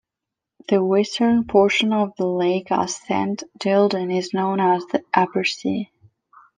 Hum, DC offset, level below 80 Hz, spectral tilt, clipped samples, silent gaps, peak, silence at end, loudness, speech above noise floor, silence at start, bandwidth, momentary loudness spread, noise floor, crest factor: none; under 0.1%; -60 dBFS; -5 dB/octave; under 0.1%; none; -2 dBFS; 0.7 s; -20 LUFS; 65 dB; 0.7 s; 9.8 kHz; 9 LU; -85 dBFS; 18 dB